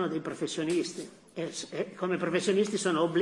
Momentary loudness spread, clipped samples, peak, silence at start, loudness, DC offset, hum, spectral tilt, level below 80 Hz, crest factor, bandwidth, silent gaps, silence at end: 10 LU; under 0.1%; -14 dBFS; 0 s; -31 LUFS; under 0.1%; none; -4.5 dB/octave; -76 dBFS; 16 dB; 12 kHz; none; 0 s